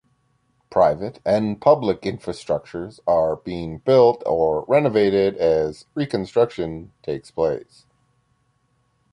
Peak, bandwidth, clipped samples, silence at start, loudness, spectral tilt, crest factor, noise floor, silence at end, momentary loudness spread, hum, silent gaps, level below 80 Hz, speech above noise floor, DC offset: -2 dBFS; 10.5 kHz; under 0.1%; 0.7 s; -21 LUFS; -7 dB/octave; 18 dB; -66 dBFS; 1.5 s; 13 LU; none; none; -50 dBFS; 46 dB; under 0.1%